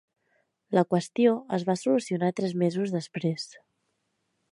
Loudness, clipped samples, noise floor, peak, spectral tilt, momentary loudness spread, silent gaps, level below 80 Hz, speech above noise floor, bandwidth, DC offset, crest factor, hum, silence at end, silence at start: -27 LUFS; under 0.1%; -77 dBFS; -8 dBFS; -6.5 dB/octave; 7 LU; none; -74 dBFS; 50 dB; 11.5 kHz; under 0.1%; 20 dB; none; 1 s; 0.7 s